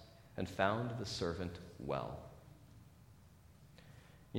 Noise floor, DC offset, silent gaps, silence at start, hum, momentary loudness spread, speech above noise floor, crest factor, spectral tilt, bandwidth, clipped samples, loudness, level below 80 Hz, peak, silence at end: -62 dBFS; under 0.1%; none; 0 s; none; 26 LU; 22 dB; 28 dB; -5.5 dB/octave; 16.5 kHz; under 0.1%; -41 LUFS; -62 dBFS; -16 dBFS; 0 s